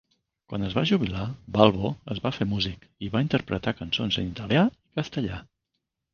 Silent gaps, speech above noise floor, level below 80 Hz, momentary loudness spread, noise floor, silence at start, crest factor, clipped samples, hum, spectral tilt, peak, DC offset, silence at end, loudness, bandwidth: none; 55 dB; -48 dBFS; 12 LU; -81 dBFS; 0.5 s; 26 dB; under 0.1%; none; -7 dB/octave; 0 dBFS; under 0.1%; 0.7 s; -26 LUFS; 7 kHz